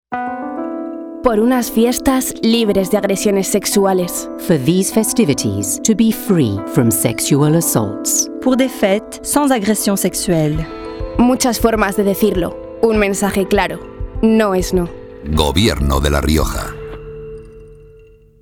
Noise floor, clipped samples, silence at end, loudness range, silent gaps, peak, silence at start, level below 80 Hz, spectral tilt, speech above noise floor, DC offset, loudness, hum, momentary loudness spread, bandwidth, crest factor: -44 dBFS; under 0.1%; 0.55 s; 2 LU; none; -2 dBFS; 0.1 s; -30 dBFS; -4.5 dB/octave; 29 dB; under 0.1%; -15 LUFS; none; 11 LU; 18.5 kHz; 14 dB